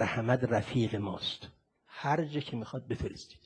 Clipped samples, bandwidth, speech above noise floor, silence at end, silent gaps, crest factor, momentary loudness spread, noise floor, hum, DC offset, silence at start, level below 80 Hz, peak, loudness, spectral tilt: under 0.1%; 10 kHz; 20 dB; 0.1 s; none; 22 dB; 11 LU; -53 dBFS; none; under 0.1%; 0 s; -56 dBFS; -12 dBFS; -33 LUFS; -6.5 dB/octave